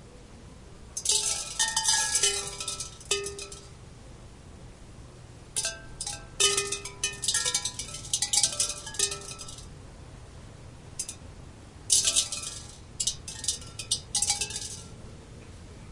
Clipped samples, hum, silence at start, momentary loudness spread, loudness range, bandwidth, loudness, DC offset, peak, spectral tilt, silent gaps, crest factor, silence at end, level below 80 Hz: under 0.1%; none; 0 s; 25 LU; 9 LU; 11.5 kHz; -27 LUFS; under 0.1%; -6 dBFS; 0 dB/octave; none; 26 dB; 0 s; -52 dBFS